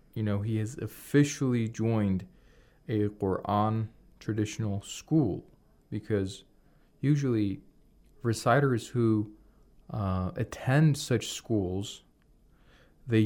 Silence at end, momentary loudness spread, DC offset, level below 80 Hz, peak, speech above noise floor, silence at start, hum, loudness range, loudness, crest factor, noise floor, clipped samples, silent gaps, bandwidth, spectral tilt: 0 s; 15 LU; under 0.1%; -60 dBFS; -12 dBFS; 33 dB; 0.15 s; none; 4 LU; -30 LUFS; 18 dB; -62 dBFS; under 0.1%; none; 17 kHz; -6.5 dB/octave